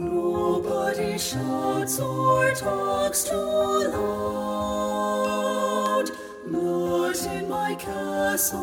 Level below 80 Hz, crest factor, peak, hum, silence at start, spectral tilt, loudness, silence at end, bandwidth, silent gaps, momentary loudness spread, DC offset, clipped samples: -52 dBFS; 16 dB; -10 dBFS; none; 0 s; -4 dB/octave; -25 LUFS; 0 s; 18 kHz; none; 5 LU; under 0.1%; under 0.1%